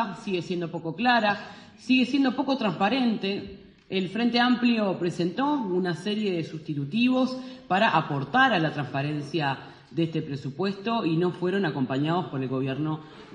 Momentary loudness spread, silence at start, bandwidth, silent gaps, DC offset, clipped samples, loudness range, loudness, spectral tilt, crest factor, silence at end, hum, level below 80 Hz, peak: 10 LU; 0 s; 9.8 kHz; none; under 0.1%; under 0.1%; 3 LU; -26 LUFS; -6.5 dB/octave; 18 dB; 0 s; none; -66 dBFS; -8 dBFS